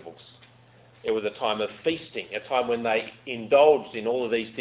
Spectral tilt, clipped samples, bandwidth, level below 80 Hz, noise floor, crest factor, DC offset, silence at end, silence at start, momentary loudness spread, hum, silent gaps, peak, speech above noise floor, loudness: -8.5 dB/octave; under 0.1%; 4 kHz; -66 dBFS; -55 dBFS; 20 dB; under 0.1%; 0 s; 0.05 s; 15 LU; none; none; -6 dBFS; 30 dB; -25 LUFS